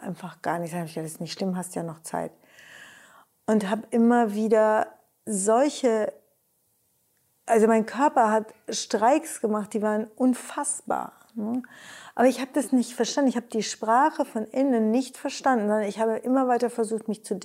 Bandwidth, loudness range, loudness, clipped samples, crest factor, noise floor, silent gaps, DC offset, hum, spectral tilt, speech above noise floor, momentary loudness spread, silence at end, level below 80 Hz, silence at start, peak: 16 kHz; 4 LU; -25 LUFS; under 0.1%; 16 dB; -69 dBFS; none; under 0.1%; none; -4.5 dB/octave; 45 dB; 12 LU; 0 s; -76 dBFS; 0 s; -8 dBFS